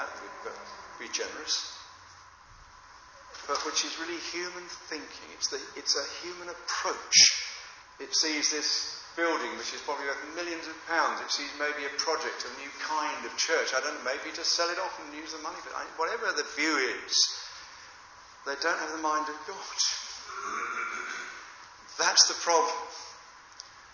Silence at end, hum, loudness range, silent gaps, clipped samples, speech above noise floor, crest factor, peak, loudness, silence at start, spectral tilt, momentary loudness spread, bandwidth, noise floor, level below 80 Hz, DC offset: 0 s; none; 9 LU; none; under 0.1%; 23 dB; 24 dB; -8 dBFS; -29 LUFS; 0 s; 1 dB/octave; 19 LU; 7.2 kHz; -53 dBFS; -70 dBFS; under 0.1%